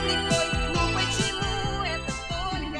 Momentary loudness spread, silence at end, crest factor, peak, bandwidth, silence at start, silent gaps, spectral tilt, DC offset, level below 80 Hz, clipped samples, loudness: 6 LU; 0 s; 16 dB; -12 dBFS; 13.5 kHz; 0 s; none; -3.5 dB/octave; under 0.1%; -36 dBFS; under 0.1%; -26 LUFS